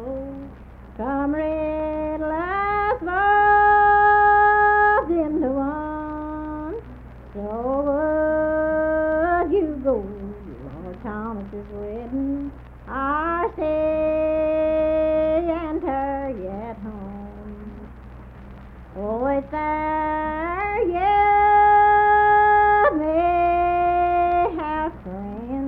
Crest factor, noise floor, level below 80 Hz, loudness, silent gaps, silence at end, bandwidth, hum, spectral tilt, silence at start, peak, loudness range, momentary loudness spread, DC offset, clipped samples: 14 dB; -41 dBFS; -40 dBFS; -20 LUFS; none; 0 s; 4.8 kHz; none; -9 dB/octave; 0 s; -8 dBFS; 12 LU; 19 LU; under 0.1%; under 0.1%